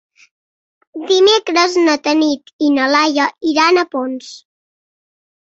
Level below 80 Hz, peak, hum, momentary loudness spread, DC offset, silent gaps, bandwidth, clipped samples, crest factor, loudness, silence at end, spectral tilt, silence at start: -64 dBFS; 0 dBFS; none; 15 LU; under 0.1%; 2.53-2.59 s; 8 kHz; under 0.1%; 16 dB; -14 LUFS; 1.05 s; -1.5 dB/octave; 0.95 s